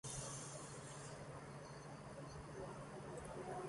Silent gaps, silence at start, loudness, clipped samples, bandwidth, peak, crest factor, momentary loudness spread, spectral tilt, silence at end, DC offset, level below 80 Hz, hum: none; 0.05 s; -52 LUFS; under 0.1%; 11.5 kHz; -36 dBFS; 16 dB; 6 LU; -4 dB/octave; 0 s; under 0.1%; -68 dBFS; none